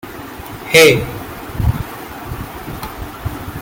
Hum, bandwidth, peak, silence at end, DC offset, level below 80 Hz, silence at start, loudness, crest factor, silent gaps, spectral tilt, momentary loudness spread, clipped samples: none; 17 kHz; 0 dBFS; 0 s; under 0.1%; -32 dBFS; 0.05 s; -14 LUFS; 18 dB; none; -4 dB/octave; 21 LU; under 0.1%